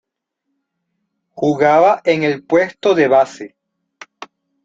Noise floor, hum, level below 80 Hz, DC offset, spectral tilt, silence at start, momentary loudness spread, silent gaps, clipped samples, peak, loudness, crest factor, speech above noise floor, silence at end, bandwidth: -76 dBFS; none; -62 dBFS; under 0.1%; -6 dB/octave; 1.35 s; 23 LU; none; under 0.1%; -2 dBFS; -14 LUFS; 16 dB; 62 dB; 0.4 s; 7.8 kHz